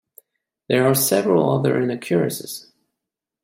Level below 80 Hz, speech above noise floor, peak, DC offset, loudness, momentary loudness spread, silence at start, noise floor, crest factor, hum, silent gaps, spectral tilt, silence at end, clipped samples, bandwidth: -64 dBFS; 65 dB; -4 dBFS; under 0.1%; -19 LUFS; 13 LU; 0.7 s; -84 dBFS; 18 dB; none; none; -5 dB/octave; 0.85 s; under 0.1%; 16.5 kHz